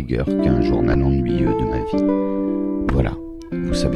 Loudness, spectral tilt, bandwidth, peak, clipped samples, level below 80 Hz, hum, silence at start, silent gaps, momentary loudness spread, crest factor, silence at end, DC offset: -20 LUFS; -8 dB/octave; 11.5 kHz; -4 dBFS; under 0.1%; -28 dBFS; none; 0 s; none; 6 LU; 16 dB; 0 s; under 0.1%